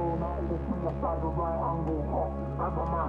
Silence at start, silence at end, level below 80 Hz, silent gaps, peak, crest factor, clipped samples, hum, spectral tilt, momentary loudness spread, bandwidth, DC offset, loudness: 0 s; 0 s; -38 dBFS; none; -18 dBFS; 12 dB; under 0.1%; none; -11 dB/octave; 2 LU; 4.1 kHz; under 0.1%; -31 LUFS